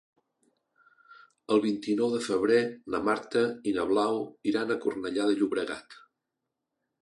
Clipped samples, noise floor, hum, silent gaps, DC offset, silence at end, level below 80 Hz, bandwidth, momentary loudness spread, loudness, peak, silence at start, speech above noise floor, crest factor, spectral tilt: under 0.1%; -85 dBFS; none; none; under 0.1%; 1.05 s; -68 dBFS; 11.5 kHz; 6 LU; -28 LUFS; -12 dBFS; 1.15 s; 57 dB; 18 dB; -5 dB/octave